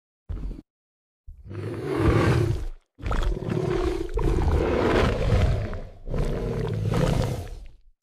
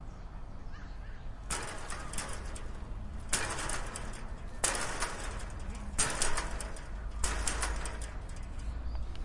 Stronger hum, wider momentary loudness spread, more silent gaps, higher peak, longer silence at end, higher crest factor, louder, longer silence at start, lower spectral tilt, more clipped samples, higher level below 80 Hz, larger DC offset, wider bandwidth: neither; about the same, 17 LU vs 15 LU; first, 0.70-1.24 s vs none; first, -8 dBFS vs -12 dBFS; first, 0.3 s vs 0 s; second, 16 dB vs 22 dB; first, -26 LUFS vs -37 LUFS; first, 0.3 s vs 0 s; first, -7 dB/octave vs -2.5 dB/octave; neither; first, -30 dBFS vs -40 dBFS; first, 0.2% vs under 0.1%; first, 14.5 kHz vs 11.5 kHz